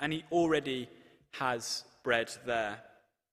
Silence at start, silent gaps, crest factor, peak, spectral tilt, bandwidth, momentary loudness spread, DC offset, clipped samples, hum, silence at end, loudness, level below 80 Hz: 0 s; none; 20 dB; -14 dBFS; -4 dB/octave; 15.5 kHz; 13 LU; under 0.1%; under 0.1%; none; 0.45 s; -33 LUFS; -68 dBFS